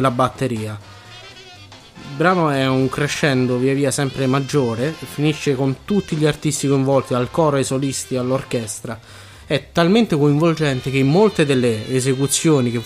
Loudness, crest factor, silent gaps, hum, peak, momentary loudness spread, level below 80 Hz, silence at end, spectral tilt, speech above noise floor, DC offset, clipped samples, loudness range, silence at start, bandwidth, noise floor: -18 LUFS; 16 dB; none; none; -2 dBFS; 14 LU; -50 dBFS; 0 s; -5.5 dB/octave; 23 dB; under 0.1%; under 0.1%; 3 LU; 0 s; 15.5 kHz; -41 dBFS